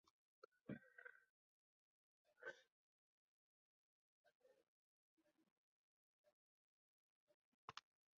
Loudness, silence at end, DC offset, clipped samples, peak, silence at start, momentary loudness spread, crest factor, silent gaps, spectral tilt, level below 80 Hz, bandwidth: -61 LUFS; 0.4 s; under 0.1%; under 0.1%; -38 dBFS; 0.65 s; 6 LU; 30 dB; 1.30-2.25 s, 2.72-4.24 s, 4.35-4.40 s, 4.68-5.17 s, 5.51-6.24 s, 6.33-7.27 s, 7.34-7.68 s; -3.5 dB/octave; under -90 dBFS; 5.4 kHz